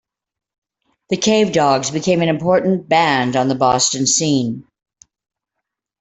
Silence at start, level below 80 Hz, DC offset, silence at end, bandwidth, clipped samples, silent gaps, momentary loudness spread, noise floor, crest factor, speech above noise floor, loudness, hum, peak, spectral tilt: 1.1 s; -56 dBFS; under 0.1%; 1.4 s; 8.4 kHz; under 0.1%; none; 5 LU; -80 dBFS; 16 dB; 64 dB; -16 LUFS; none; -2 dBFS; -4 dB/octave